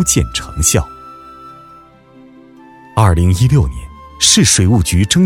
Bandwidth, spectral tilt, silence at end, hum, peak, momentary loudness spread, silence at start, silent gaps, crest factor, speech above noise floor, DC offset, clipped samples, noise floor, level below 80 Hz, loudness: 16.5 kHz; -4 dB/octave; 0 s; none; 0 dBFS; 13 LU; 0 s; none; 14 dB; 31 dB; under 0.1%; under 0.1%; -42 dBFS; -26 dBFS; -12 LUFS